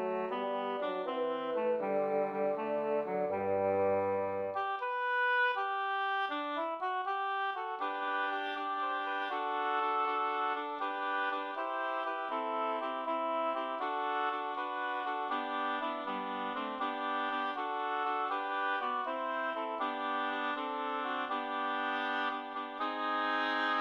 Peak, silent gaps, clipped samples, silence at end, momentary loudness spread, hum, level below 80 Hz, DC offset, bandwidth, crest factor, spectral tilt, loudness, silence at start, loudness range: -20 dBFS; none; under 0.1%; 0 s; 5 LU; none; -82 dBFS; under 0.1%; 9.6 kHz; 14 dB; -5.5 dB/octave; -34 LUFS; 0 s; 3 LU